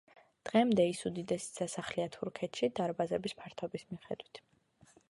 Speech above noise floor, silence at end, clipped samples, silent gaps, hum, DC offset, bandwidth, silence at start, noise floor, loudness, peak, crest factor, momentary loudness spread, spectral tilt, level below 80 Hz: 31 dB; 0.7 s; under 0.1%; none; none; under 0.1%; 11.5 kHz; 0.45 s; -66 dBFS; -35 LUFS; -16 dBFS; 20 dB; 15 LU; -5 dB/octave; -72 dBFS